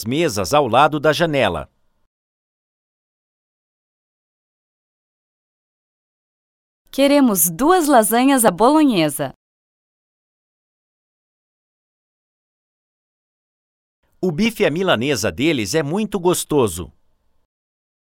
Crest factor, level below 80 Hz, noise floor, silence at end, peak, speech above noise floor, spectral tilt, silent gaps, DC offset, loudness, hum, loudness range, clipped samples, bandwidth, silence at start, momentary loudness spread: 20 dB; -52 dBFS; under -90 dBFS; 1.25 s; 0 dBFS; over 74 dB; -4 dB/octave; 2.07-6.85 s, 9.36-14.03 s; under 0.1%; -16 LUFS; none; 12 LU; under 0.1%; 18 kHz; 0 s; 10 LU